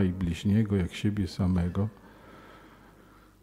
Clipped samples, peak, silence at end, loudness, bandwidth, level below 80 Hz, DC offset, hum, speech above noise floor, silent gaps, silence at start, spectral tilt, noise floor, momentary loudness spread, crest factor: under 0.1%; -14 dBFS; 0.75 s; -29 LUFS; 13 kHz; -48 dBFS; under 0.1%; none; 28 dB; none; 0 s; -7.5 dB/octave; -56 dBFS; 9 LU; 16 dB